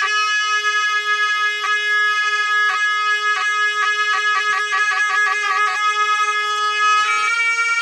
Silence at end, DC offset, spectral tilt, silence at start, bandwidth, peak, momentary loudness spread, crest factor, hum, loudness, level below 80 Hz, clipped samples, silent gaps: 0 s; under 0.1%; 3.5 dB/octave; 0 s; 11.5 kHz; -6 dBFS; 2 LU; 12 dB; none; -16 LUFS; -78 dBFS; under 0.1%; none